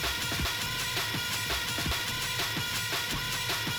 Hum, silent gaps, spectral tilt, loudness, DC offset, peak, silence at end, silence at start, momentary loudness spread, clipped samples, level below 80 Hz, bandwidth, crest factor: none; none; -2 dB/octave; -30 LUFS; under 0.1%; -18 dBFS; 0 s; 0 s; 1 LU; under 0.1%; -46 dBFS; over 20 kHz; 12 dB